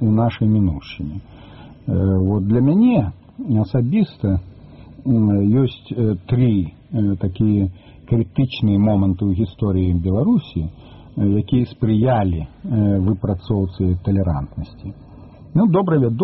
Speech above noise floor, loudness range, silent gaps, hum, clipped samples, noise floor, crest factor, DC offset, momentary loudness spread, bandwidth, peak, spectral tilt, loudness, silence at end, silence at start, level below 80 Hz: 23 dB; 2 LU; none; none; under 0.1%; -40 dBFS; 14 dB; under 0.1%; 12 LU; 5.8 kHz; -4 dBFS; -9 dB/octave; -19 LUFS; 0 s; 0 s; -38 dBFS